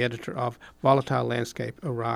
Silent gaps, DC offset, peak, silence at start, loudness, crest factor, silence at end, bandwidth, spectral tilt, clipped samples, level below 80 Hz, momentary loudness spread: none; under 0.1%; -6 dBFS; 0 s; -27 LUFS; 20 dB; 0 s; 15 kHz; -6.5 dB/octave; under 0.1%; -60 dBFS; 10 LU